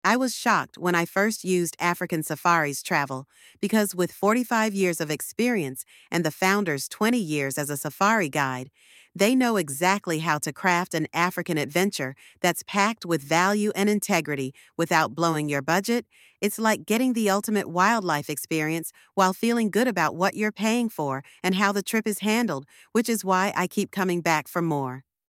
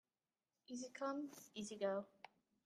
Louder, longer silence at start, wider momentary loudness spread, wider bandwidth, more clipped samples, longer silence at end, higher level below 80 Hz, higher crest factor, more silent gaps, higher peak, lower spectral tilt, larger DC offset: first, -25 LUFS vs -47 LUFS; second, 0.05 s vs 0.7 s; second, 7 LU vs 17 LU; about the same, 17 kHz vs 15.5 kHz; neither; about the same, 0.3 s vs 0.4 s; first, -72 dBFS vs under -90 dBFS; about the same, 20 dB vs 20 dB; neither; first, -4 dBFS vs -30 dBFS; about the same, -4.5 dB/octave vs -4 dB/octave; neither